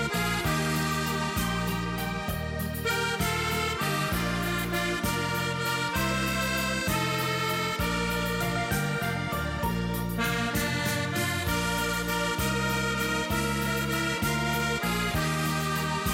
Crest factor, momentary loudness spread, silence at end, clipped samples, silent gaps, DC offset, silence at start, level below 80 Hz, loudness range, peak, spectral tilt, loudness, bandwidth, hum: 14 dB; 3 LU; 0 s; under 0.1%; none; under 0.1%; 0 s; -42 dBFS; 1 LU; -14 dBFS; -4 dB/octave; -28 LUFS; 17 kHz; none